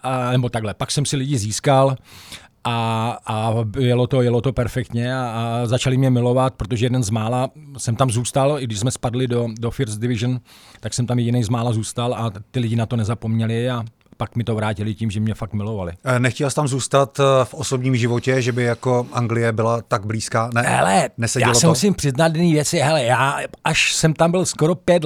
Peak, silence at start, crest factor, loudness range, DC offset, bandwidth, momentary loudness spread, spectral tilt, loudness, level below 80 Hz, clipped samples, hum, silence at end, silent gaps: -2 dBFS; 0.05 s; 18 dB; 6 LU; under 0.1%; 14.5 kHz; 9 LU; -5 dB/octave; -20 LUFS; -46 dBFS; under 0.1%; none; 0 s; none